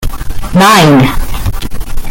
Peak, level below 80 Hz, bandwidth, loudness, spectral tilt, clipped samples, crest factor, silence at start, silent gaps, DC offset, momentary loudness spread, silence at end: 0 dBFS; -16 dBFS; 17.5 kHz; -8 LUFS; -5 dB/octave; 0.4%; 8 dB; 0 s; none; under 0.1%; 18 LU; 0 s